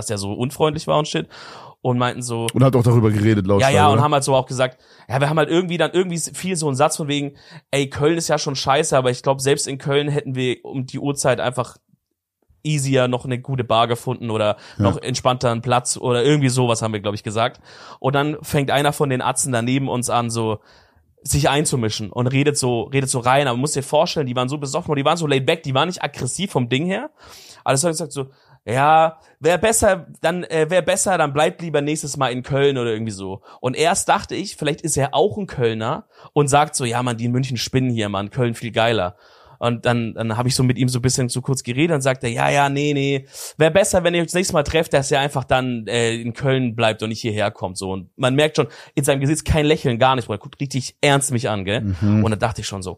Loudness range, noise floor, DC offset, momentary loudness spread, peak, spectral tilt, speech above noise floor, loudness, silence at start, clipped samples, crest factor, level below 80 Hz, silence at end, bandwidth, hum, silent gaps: 4 LU; -72 dBFS; under 0.1%; 8 LU; 0 dBFS; -4.5 dB/octave; 53 dB; -19 LUFS; 0 s; under 0.1%; 18 dB; -46 dBFS; 0 s; 15.5 kHz; none; none